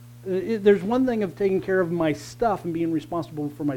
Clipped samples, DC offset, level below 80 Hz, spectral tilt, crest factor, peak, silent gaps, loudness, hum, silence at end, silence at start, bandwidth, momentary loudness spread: under 0.1%; under 0.1%; -54 dBFS; -7 dB/octave; 18 dB; -6 dBFS; none; -24 LUFS; none; 0 s; 0 s; 16.5 kHz; 9 LU